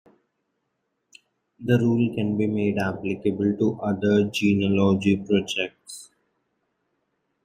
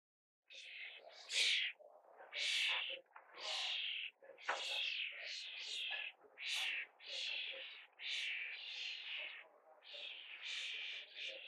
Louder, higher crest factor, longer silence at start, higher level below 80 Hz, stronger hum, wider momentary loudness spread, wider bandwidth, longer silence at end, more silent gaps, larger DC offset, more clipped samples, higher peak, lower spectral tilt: first, -23 LUFS vs -42 LUFS; about the same, 18 dB vs 22 dB; first, 1.6 s vs 0.5 s; first, -62 dBFS vs under -90 dBFS; neither; second, 9 LU vs 16 LU; about the same, 14 kHz vs 13.5 kHz; first, 1.4 s vs 0 s; neither; neither; neither; first, -6 dBFS vs -24 dBFS; first, -6.5 dB/octave vs 4.5 dB/octave